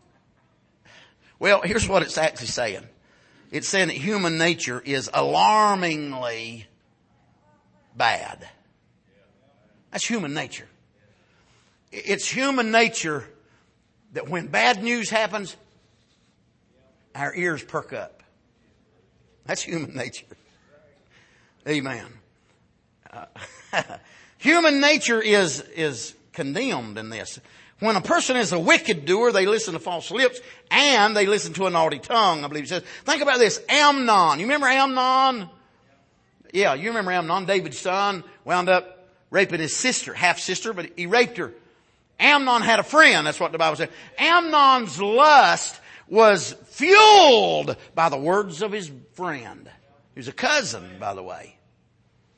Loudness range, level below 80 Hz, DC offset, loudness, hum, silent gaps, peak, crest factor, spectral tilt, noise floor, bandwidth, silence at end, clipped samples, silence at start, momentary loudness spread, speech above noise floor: 16 LU; -60 dBFS; under 0.1%; -20 LUFS; none; none; -2 dBFS; 20 dB; -3 dB/octave; -63 dBFS; 8.8 kHz; 0.9 s; under 0.1%; 1.4 s; 17 LU; 42 dB